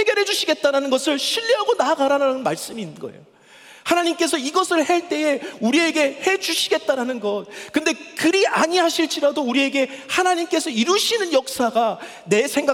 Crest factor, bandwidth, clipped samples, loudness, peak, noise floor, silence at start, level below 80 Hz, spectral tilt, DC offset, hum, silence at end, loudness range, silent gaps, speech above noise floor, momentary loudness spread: 16 dB; 18 kHz; under 0.1%; -20 LUFS; -4 dBFS; -46 dBFS; 0 s; -70 dBFS; -2.5 dB/octave; under 0.1%; none; 0 s; 2 LU; none; 26 dB; 7 LU